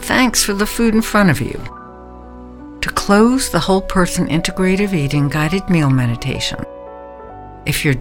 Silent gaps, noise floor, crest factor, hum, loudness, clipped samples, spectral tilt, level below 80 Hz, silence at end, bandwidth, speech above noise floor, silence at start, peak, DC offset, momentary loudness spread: none; -35 dBFS; 16 dB; none; -16 LUFS; under 0.1%; -5 dB/octave; -32 dBFS; 0 s; 17.5 kHz; 20 dB; 0 s; 0 dBFS; under 0.1%; 22 LU